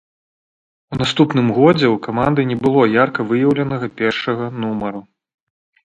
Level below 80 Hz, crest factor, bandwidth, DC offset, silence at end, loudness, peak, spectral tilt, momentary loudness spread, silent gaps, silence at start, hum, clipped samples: -50 dBFS; 18 dB; 9 kHz; under 0.1%; 0.85 s; -16 LUFS; 0 dBFS; -7 dB/octave; 9 LU; none; 0.9 s; none; under 0.1%